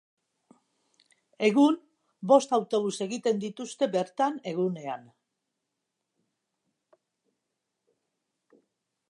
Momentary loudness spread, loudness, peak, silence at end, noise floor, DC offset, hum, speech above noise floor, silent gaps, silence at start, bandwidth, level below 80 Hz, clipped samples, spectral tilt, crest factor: 15 LU; -27 LUFS; -6 dBFS; 4.1 s; -84 dBFS; under 0.1%; none; 57 dB; none; 1.4 s; 11 kHz; -84 dBFS; under 0.1%; -5.5 dB/octave; 24 dB